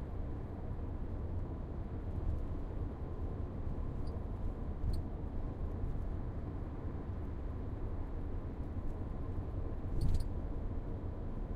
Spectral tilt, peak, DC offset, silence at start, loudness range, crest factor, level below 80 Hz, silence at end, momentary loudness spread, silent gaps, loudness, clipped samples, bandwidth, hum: -9 dB/octave; -20 dBFS; under 0.1%; 0 s; 1 LU; 18 dB; -40 dBFS; 0 s; 3 LU; none; -43 LUFS; under 0.1%; 9.6 kHz; none